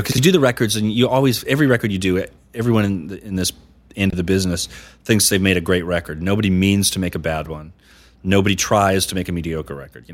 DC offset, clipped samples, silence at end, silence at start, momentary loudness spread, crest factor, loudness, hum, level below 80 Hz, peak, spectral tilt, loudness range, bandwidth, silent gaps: under 0.1%; under 0.1%; 0 s; 0 s; 13 LU; 18 dB; -18 LUFS; none; -42 dBFS; -2 dBFS; -4.5 dB/octave; 3 LU; 16.5 kHz; none